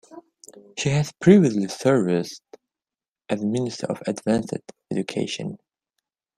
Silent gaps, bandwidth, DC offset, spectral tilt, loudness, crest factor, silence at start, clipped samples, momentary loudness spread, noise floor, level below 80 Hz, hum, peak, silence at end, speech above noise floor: 3.08-3.12 s; 13 kHz; under 0.1%; -6 dB/octave; -23 LUFS; 22 dB; 0.1 s; under 0.1%; 18 LU; under -90 dBFS; -58 dBFS; none; -2 dBFS; 0.8 s; over 68 dB